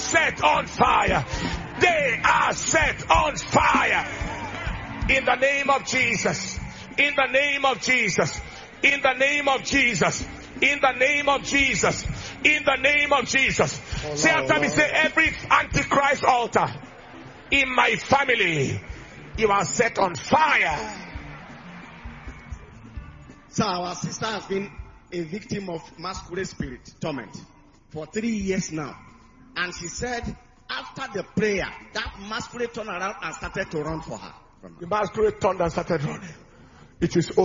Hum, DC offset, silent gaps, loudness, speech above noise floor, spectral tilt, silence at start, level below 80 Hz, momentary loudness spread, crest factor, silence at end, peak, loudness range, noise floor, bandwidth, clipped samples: none; under 0.1%; none; -22 LUFS; 27 dB; -3.5 dB/octave; 0 s; -42 dBFS; 18 LU; 22 dB; 0 s; -2 dBFS; 11 LU; -50 dBFS; 7.6 kHz; under 0.1%